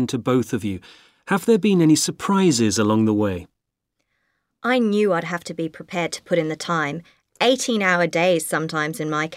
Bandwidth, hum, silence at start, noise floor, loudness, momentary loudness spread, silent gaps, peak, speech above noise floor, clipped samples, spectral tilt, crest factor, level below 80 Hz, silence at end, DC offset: 16 kHz; none; 0 s; -77 dBFS; -20 LUFS; 11 LU; none; -4 dBFS; 57 dB; under 0.1%; -4.5 dB/octave; 16 dB; -60 dBFS; 0 s; under 0.1%